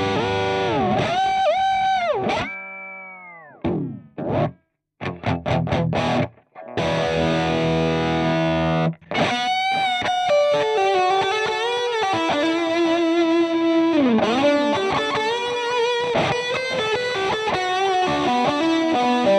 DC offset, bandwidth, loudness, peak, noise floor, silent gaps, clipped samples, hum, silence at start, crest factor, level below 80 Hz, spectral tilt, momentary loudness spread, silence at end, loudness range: under 0.1%; 11 kHz; -20 LUFS; -8 dBFS; -54 dBFS; none; under 0.1%; none; 0 s; 12 dB; -48 dBFS; -5.5 dB/octave; 9 LU; 0 s; 6 LU